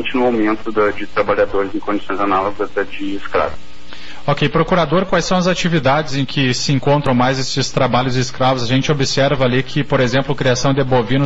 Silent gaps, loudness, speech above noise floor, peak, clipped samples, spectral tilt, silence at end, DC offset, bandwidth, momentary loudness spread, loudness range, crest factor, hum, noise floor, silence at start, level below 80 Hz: none; -16 LUFS; 21 dB; -4 dBFS; under 0.1%; -4.5 dB/octave; 0 s; 5%; 8 kHz; 6 LU; 4 LU; 12 dB; none; -37 dBFS; 0 s; -38 dBFS